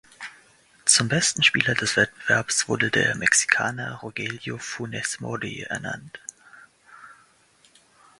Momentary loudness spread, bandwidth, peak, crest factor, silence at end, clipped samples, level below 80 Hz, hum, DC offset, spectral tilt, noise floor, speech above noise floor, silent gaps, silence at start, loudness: 17 LU; 11.5 kHz; 0 dBFS; 26 dB; 1.05 s; under 0.1%; -60 dBFS; none; under 0.1%; -2 dB/octave; -59 dBFS; 35 dB; none; 0.2 s; -22 LUFS